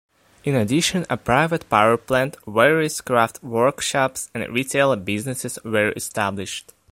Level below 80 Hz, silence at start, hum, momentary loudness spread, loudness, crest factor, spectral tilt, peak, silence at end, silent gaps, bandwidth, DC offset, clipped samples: -52 dBFS; 0.45 s; none; 9 LU; -21 LUFS; 20 dB; -4 dB/octave; 0 dBFS; 0.3 s; none; 16.5 kHz; under 0.1%; under 0.1%